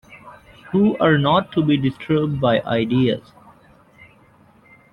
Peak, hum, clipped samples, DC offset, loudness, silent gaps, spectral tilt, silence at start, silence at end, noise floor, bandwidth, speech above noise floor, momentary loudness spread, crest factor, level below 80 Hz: -4 dBFS; none; under 0.1%; under 0.1%; -19 LUFS; none; -9 dB/octave; 0.1 s; 1.75 s; -52 dBFS; 5.4 kHz; 34 dB; 5 LU; 16 dB; -52 dBFS